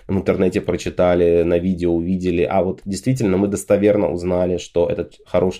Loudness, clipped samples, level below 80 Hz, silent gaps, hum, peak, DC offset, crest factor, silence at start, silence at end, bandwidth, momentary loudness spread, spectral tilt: -19 LUFS; under 0.1%; -42 dBFS; none; none; -4 dBFS; under 0.1%; 14 dB; 0.1 s; 0 s; 14.5 kHz; 6 LU; -7 dB/octave